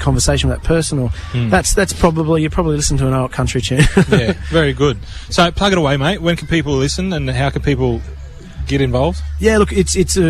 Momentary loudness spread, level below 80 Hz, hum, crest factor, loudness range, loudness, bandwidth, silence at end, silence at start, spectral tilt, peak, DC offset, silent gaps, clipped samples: 7 LU; -24 dBFS; none; 14 dB; 3 LU; -15 LUFS; 13.5 kHz; 0 s; 0 s; -5 dB/octave; 0 dBFS; under 0.1%; none; under 0.1%